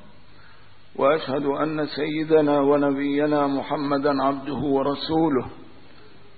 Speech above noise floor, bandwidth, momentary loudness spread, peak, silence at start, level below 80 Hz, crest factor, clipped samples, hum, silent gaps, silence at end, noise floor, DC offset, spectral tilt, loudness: 30 dB; 4.8 kHz; 7 LU; -8 dBFS; 1 s; -56 dBFS; 16 dB; under 0.1%; none; none; 0.75 s; -52 dBFS; 0.8%; -11 dB/octave; -22 LUFS